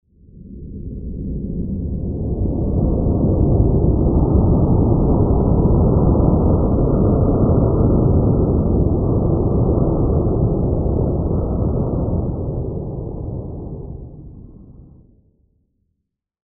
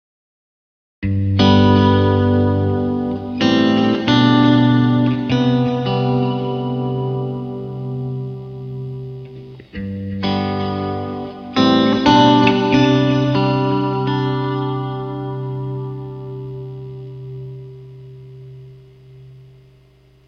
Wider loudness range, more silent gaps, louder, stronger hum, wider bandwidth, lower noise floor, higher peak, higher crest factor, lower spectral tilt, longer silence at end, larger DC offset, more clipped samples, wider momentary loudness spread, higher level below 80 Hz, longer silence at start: second, 12 LU vs 15 LU; neither; about the same, -18 LUFS vs -17 LUFS; neither; second, 1.5 kHz vs 6.6 kHz; first, -75 dBFS vs -50 dBFS; about the same, -2 dBFS vs 0 dBFS; about the same, 16 dB vs 18 dB; first, -17 dB/octave vs -7.5 dB/octave; first, 1.85 s vs 0.85 s; neither; neither; second, 13 LU vs 20 LU; first, -22 dBFS vs -46 dBFS; second, 0.35 s vs 1 s